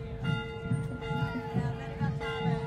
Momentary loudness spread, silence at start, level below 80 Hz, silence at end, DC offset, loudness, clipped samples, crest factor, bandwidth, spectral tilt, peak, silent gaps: 2 LU; 0 s; -48 dBFS; 0 s; under 0.1%; -34 LUFS; under 0.1%; 14 dB; 9.8 kHz; -7.5 dB/octave; -18 dBFS; none